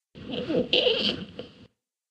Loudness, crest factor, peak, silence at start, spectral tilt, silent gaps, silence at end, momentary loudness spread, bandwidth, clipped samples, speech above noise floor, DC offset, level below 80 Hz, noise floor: -25 LUFS; 22 dB; -8 dBFS; 0.15 s; -5 dB/octave; none; 0.45 s; 18 LU; 8.8 kHz; under 0.1%; 32 dB; under 0.1%; -60 dBFS; -58 dBFS